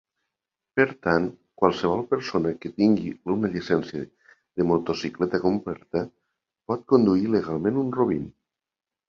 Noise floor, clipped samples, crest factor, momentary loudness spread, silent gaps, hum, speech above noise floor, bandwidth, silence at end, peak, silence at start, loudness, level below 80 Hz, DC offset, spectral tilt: -90 dBFS; under 0.1%; 22 dB; 10 LU; none; none; 66 dB; 7.2 kHz; 0.8 s; -2 dBFS; 0.75 s; -25 LUFS; -56 dBFS; under 0.1%; -7.5 dB/octave